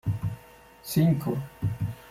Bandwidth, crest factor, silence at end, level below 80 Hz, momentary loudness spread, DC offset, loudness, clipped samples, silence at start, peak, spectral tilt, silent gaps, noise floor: 16 kHz; 16 dB; 0 s; -50 dBFS; 15 LU; under 0.1%; -28 LUFS; under 0.1%; 0.05 s; -12 dBFS; -7 dB/octave; none; -51 dBFS